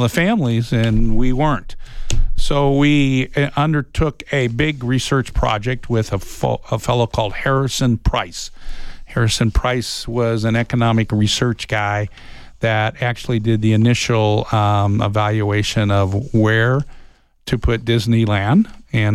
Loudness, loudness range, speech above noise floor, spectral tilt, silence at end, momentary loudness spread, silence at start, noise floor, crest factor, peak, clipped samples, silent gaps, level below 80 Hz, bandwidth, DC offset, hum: -18 LUFS; 3 LU; 26 dB; -6 dB/octave; 0 s; 8 LU; 0 s; -43 dBFS; 12 dB; -4 dBFS; under 0.1%; none; -26 dBFS; 13.5 kHz; under 0.1%; none